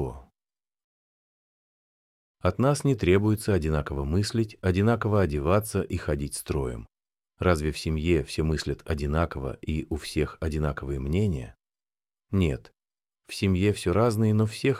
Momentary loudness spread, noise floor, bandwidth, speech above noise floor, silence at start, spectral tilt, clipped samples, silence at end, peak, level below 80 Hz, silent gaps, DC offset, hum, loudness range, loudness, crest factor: 8 LU; under -90 dBFS; 15.5 kHz; over 65 dB; 0 s; -6.5 dB/octave; under 0.1%; 0 s; -8 dBFS; -40 dBFS; 0.84-2.35 s; under 0.1%; none; 5 LU; -27 LUFS; 18 dB